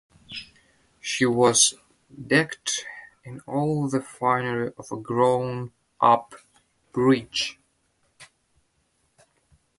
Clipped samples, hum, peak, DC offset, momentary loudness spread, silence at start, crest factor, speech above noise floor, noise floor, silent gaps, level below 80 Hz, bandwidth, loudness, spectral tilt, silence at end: under 0.1%; none; -4 dBFS; under 0.1%; 19 LU; 0.3 s; 22 dB; 46 dB; -70 dBFS; none; -64 dBFS; 11.5 kHz; -23 LUFS; -3.5 dB/octave; 1.55 s